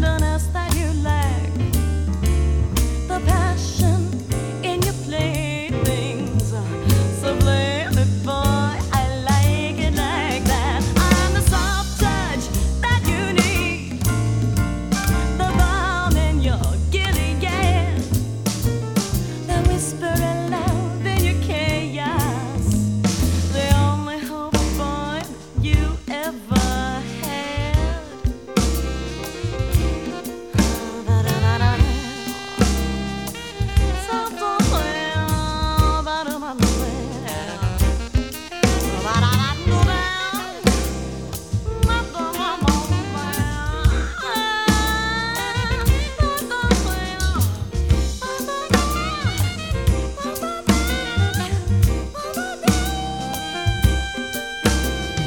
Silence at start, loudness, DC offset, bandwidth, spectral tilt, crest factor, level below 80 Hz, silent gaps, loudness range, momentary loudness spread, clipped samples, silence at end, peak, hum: 0 s; -21 LUFS; 0.3%; 19 kHz; -5 dB/octave; 20 dB; -26 dBFS; none; 3 LU; 8 LU; under 0.1%; 0 s; 0 dBFS; none